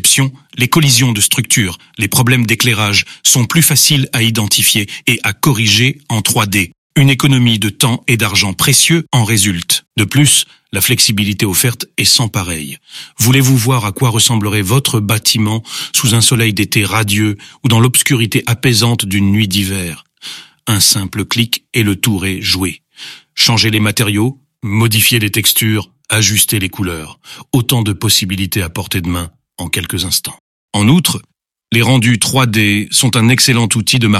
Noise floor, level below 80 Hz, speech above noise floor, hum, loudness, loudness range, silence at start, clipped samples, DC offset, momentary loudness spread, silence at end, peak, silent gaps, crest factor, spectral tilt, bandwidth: -34 dBFS; -44 dBFS; 22 dB; none; -11 LUFS; 4 LU; 0 s; under 0.1%; under 0.1%; 10 LU; 0 s; 0 dBFS; 6.78-6.90 s, 30.40-30.68 s; 12 dB; -3.5 dB/octave; 16.5 kHz